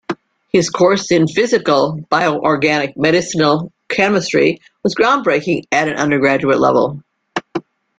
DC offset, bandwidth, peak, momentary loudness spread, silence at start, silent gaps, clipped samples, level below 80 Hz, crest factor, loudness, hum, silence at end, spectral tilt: under 0.1%; 9.4 kHz; 0 dBFS; 11 LU; 0.1 s; none; under 0.1%; -54 dBFS; 14 dB; -15 LUFS; none; 0.4 s; -5 dB/octave